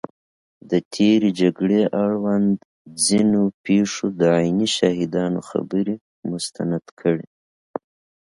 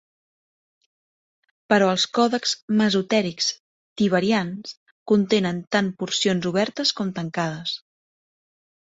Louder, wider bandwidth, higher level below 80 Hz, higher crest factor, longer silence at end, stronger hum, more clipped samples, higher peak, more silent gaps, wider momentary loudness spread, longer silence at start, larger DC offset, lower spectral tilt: about the same, -20 LUFS vs -22 LUFS; first, 11.5 kHz vs 8 kHz; first, -58 dBFS vs -64 dBFS; about the same, 18 dB vs 20 dB; about the same, 1.05 s vs 1.05 s; neither; neither; about the same, -2 dBFS vs -4 dBFS; second, 0.85-0.91 s, 2.65-2.85 s, 3.54-3.64 s, 6.01-6.23 s, 6.91-6.97 s vs 2.62-2.68 s, 3.60-3.96 s, 4.77-5.06 s; about the same, 12 LU vs 11 LU; second, 0.65 s vs 1.7 s; neither; about the same, -5 dB/octave vs -4.5 dB/octave